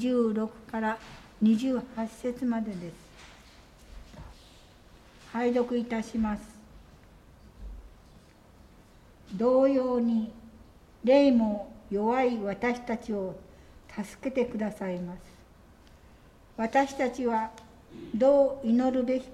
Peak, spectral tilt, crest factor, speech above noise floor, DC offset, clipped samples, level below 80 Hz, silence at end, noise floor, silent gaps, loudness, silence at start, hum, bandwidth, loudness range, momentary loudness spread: -10 dBFS; -6.5 dB/octave; 20 dB; 28 dB; under 0.1%; under 0.1%; -54 dBFS; 0 s; -55 dBFS; none; -28 LUFS; 0 s; none; 12 kHz; 10 LU; 24 LU